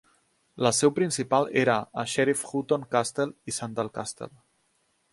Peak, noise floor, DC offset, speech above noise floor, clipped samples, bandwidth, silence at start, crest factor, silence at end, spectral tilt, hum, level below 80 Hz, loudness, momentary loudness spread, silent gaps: -6 dBFS; -71 dBFS; under 0.1%; 44 dB; under 0.1%; 11.5 kHz; 0.55 s; 22 dB; 0.85 s; -4 dB/octave; none; -66 dBFS; -26 LUFS; 11 LU; none